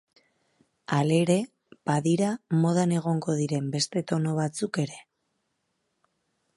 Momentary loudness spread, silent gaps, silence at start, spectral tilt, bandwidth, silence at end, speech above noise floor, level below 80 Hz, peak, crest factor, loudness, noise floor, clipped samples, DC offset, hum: 10 LU; none; 0.9 s; -6 dB/octave; 11.5 kHz; 1.55 s; 52 dB; -72 dBFS; -8 dBFS; 20 dB; -26 LUFS; -77 dBFS; under 0.1%; under 0.1%; none